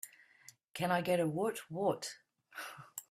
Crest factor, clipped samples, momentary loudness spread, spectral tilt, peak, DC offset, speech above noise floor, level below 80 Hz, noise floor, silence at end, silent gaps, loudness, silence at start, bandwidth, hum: 20 dB; under 0.1%; 19 LU; -5 dB/octave; -18 dBFS; under 0.1%; 28 dB; -78 dBFS; -63 dBFS; 0.1 s; 0.64-0.68 s; -36 LUFS; 0.05 s; 16 kHz; none